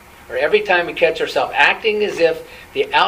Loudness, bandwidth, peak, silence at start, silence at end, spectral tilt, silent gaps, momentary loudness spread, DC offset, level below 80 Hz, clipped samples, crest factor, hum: -16 LUFS; 15.5 kHz; 0 dBFS; 0.3 s; 0 s; -3.5 dB/octave; none; 11 LU; under 0.1%; -52 dBFS; under 0.1%; 18 dB; none